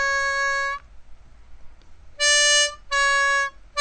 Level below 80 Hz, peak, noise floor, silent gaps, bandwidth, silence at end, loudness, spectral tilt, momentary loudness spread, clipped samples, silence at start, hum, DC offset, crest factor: -48 dBFS; -6 dBFS; -43 dBFS; none; 9.6 kHz; 0 s; -19 LUFS; 3 dB/octave; 11 LU; under 0.1%; 0 s; none; 0.3%; 16 dB